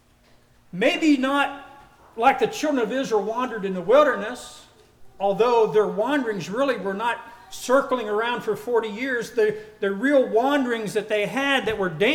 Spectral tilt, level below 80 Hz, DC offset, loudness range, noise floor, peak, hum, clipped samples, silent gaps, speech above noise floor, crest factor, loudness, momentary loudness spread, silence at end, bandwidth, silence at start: -4.5 dB/octave; -60 dBFS; under 0.1%; 2 LU; -56 dBFS; -6 dBFS; none; under 0.1%; none; 34 dB; 16 dB; -22 LUFS; 9 LU; 0 s; 16.5 kHz; 0.75 s